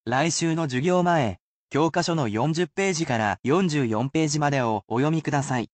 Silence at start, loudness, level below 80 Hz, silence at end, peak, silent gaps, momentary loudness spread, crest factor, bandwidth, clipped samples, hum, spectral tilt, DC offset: 0.05 s; -24 LUFS; -60 dBFS; 0.1 s; -10 dBFS; 1.40-1.68 s, 3.39-3.43 s; 3 LU; 14 dB; 9 kHz; under 0.1%; none; -5 dB/octave; under 0.1%